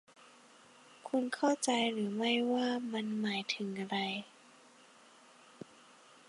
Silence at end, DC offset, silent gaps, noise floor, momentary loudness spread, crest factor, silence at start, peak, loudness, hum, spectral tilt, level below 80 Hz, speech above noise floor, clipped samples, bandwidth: 2 s; under 0.1%; none; -61 dBFS; 22 LU; 18 dB; 1.05 s; -18 dBFS; -34 LUFS; none; -3.5 dB/octave; -86 dBFS; 27 dB; under 0.1%; 11.5 kHz